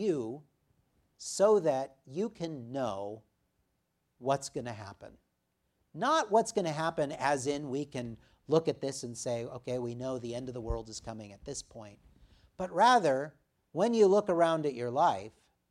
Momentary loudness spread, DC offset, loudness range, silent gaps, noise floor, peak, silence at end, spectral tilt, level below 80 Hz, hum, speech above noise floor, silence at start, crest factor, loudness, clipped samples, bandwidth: 18 LU; under 0.1%; 10 LU; none; -79 dBFS; -12 dBFS; 0.4 s; -5 dB/octave; -56 dBFS; none; 48 dB; 0 s; 20 dB; -31 LUFS; under 0.1%; 13 kHz